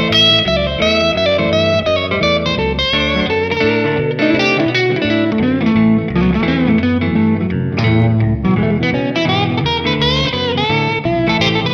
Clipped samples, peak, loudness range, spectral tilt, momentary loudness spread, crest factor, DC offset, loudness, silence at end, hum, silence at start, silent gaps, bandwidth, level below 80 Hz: under 0.1%; 0 dBFS; 1 LU; -6 dB/octave; 3 LU; 14 dB; under 0.1%; -14 LUFS; 0 s; none; 0 s; none; 7.4 kHz; -32 dBFS